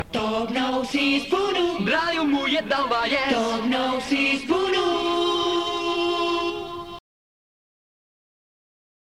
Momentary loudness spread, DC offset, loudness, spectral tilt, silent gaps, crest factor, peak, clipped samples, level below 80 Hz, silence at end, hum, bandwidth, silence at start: 4 LU; 0.2%; -23 LUFS; -4 dB/octave; none; 14 dB; -10 dBFS; under 0.1%; -56 dBFS; 2 s; none; 14.5 kHz; 0 s